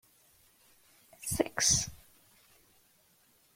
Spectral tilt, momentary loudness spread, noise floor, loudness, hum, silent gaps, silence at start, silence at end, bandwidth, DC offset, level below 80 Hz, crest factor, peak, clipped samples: -2 dB/octave; 15 LU; -67 dBFS; -30 LUFS; none; none; 1.2 s; 1.6 s; 16.5 kHz; under 0.1%; -58 dBFS; 26 dB; -12 dBFS; under 0.1%